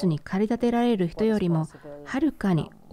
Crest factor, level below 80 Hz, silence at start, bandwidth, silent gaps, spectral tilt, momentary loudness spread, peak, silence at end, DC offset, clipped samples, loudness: 12 dB; -52 dBFS; 0 s; 13 kHz; none; -8 dB/octave; 7 LU; -12 dBFS; 0.25 s; under 0.1%; under 0.1%; -25 LUFS